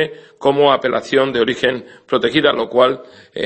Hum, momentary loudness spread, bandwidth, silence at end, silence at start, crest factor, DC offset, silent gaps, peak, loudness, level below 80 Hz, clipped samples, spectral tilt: none; 9 LU; 8.6 kHz; 0 s; 0 s; 16 dB; under 0.1%; none; 0 dBFS; -16 LUFS; -56 dBFS; under 0.1%; -5 dB/octave